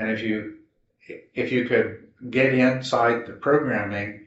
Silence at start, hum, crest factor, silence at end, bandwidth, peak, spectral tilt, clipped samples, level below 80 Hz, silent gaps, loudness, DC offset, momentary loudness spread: 0 s; none; 18 dB; 0.05 s; 8 kHz; -6 dBFS; -4.5 dB/octave; under 0.1%; -64 dBFS; none; -23 LUFS; under 0.1%; 17 LU